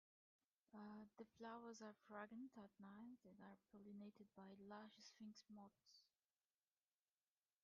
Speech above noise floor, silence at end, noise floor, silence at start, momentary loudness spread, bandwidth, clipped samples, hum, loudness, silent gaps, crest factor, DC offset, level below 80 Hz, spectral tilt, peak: over 29 dB; 1.55 s; under -90 dBFS; 0.7 s; 8 LU; 7 kHz; under 0.1%; none; -62 LUFS; none; 20 dB; under 0.1%; under -90 dBFS; -4.5 dB/octave; -42 dBFS